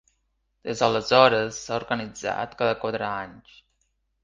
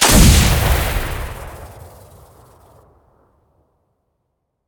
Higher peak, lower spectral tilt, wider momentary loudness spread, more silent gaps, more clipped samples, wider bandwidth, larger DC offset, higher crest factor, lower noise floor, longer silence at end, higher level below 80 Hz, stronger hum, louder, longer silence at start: about the same, 0 dBFS vs 0 dBFS; about the same, -4 dB/octave vs -3.5 dB/octave; second, 16 LU vs 26 LU; neither; neither; second, 9.6 kHz vs over 20 kHz; neither; first, 24 dB vs 18 dB; about the same, -73 dBFS vs -72 dBFS; second, 0.85 s vs 2.8 s; second, -58 dBFS vs -22 dBFS; neither; second, -24 LUFS vs -14 LUFS; first, 0.65 s vs 0 s